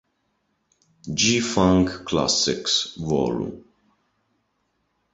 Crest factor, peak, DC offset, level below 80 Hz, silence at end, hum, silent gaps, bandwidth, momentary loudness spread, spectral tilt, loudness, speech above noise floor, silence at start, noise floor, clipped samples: 22 dB; -4 dBFS; under 0.1%; -46 dBFS; 1.5 s; none; none; 8.2 kHz; 11 LU; -3.5 dB/octave; -21 LUFS; 50 dB; 1.05 s; -72 dBFS; under 0.1%